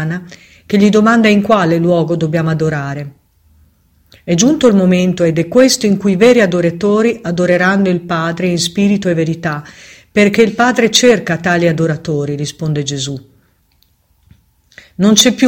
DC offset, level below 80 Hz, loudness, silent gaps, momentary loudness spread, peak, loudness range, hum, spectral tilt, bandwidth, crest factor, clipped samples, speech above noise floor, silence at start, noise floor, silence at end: under 0.1%; -48 dBFS; -12 LUFS; none; 11 LU; 0 dBFS; 5 LU; none; -5 dB/octave; 17 kHz; 12 dB; 0.1%; 44 dB; 0 s; -56 dBFS; 0 s